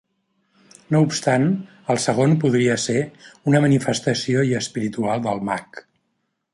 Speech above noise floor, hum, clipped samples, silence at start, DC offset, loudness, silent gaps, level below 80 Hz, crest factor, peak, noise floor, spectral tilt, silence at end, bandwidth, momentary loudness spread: 53 dB; none; under 0.1%; 0.9 s; under 0.1%; -20 LUFS; none; -60 dBFS; 18 dB; -2 dBFS; -73 dBFS; -5.5 dB/octave; 0.75 s; 11.5 kHz; 9 LU